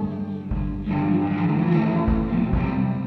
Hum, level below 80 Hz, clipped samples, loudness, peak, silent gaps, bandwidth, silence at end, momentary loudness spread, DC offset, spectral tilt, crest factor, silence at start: none; -32 dBFS; under 0.1%; -23 LUFS; -8 dBFS; none; 4.9 kHz; 0 s; 8 LU; under 0.1%; -10.5 dB/octave; 14 dB; 0 s